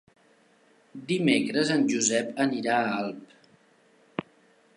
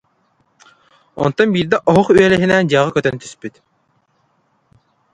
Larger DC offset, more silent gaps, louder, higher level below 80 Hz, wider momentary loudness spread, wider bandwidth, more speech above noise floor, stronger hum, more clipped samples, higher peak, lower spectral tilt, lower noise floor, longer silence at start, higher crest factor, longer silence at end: neither; neither; second, -26 LUFS vs -14 LUFS; second, -74 dBFS vs -50 dBFS; second, 15 LU vs 19 LU; about the same, 11.5 kHz vs 11 kHz; second, 36 dB vs 48 dB; neither; neither; second, -8 dBFS vs 0 dBFS; second, -3.5 dB/octave vs -6 dB/octave; about the same, -62 dBFS vs -62 dBFS; second, 0.95 s vs 1.15 s; about the same, 20 dB vs 18 dB; second, 0.55 s vs 1.65 s